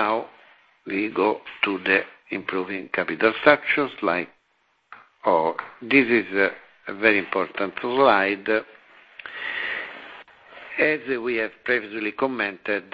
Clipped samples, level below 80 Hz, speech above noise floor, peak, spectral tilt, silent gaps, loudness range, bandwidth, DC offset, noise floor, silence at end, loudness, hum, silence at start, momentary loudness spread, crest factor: under 0.1%; -64 dBFS; 44 dB; 0 dBFS; -7.5 dB/octave; none; 5 LU; 5.2 kHz; under 0.1%; -67 dBFS; 0.1 s; -23 LUFS; none; 0 s; 15 LU; 24 dB